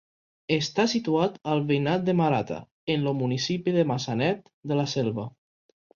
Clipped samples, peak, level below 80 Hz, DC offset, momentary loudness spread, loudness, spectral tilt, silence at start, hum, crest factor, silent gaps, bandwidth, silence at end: under 0.1%; -10 dBFS; -64 dBFS; under 0.1%; 10 LU; -26 LUFS; -6 dB/octave; 0.5 s; none; 18 dB; 2.71-2.87 s, 4.53-4.63 s; 7.4 kHz; 0.65 s